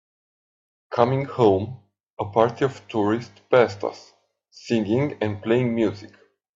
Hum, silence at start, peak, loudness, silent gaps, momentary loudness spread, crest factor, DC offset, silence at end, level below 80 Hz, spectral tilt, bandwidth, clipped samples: none; 0.9 s; -2 dBFS; -23 LUFS; 2.00-2.04 s, 2.10-2.17 s; 12 LU; 20 dB; under 0.1%; 0.5 s; -64 dBFS; -7.5 dB/octave; 7.6 kHz; under 0.1%